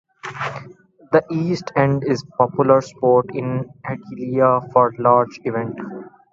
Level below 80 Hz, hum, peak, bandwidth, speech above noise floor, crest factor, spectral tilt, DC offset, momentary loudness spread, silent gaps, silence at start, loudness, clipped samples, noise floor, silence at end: -58 dBFS; none; 0 dBFS; 7.6 kHz; 26 dB; 20 dB; -7.5 dB/octave; under 0.1%; 14 LU; none; 0.25 s; -19 LUFS; under 0.1%; -45 dBFS; 0.25 s